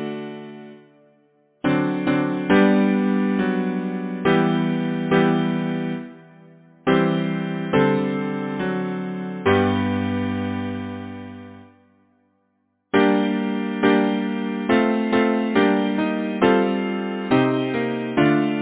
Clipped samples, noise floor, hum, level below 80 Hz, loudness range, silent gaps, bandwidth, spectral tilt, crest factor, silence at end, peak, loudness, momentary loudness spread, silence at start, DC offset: under 0.1%; -69 dBFS; none; -52 dBFS; 5 LU; none; 4 kHz; -11 dB/octave; 18 dB; 0 s; -2 dBFS; -21 LUFS; 11 LU; 0 s; under 0.1%